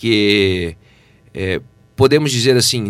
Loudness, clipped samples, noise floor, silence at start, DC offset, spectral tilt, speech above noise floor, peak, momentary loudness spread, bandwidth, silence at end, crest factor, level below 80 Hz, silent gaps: -15 LUFS; under 0.1%; -49 dBFS; 0 s; under 0.1%; -4.5 dB/octave; 34 dB; 0 dBFS; 14 LU; 15.5 kHz; 0 s; 16 dB; -46 dBFS; none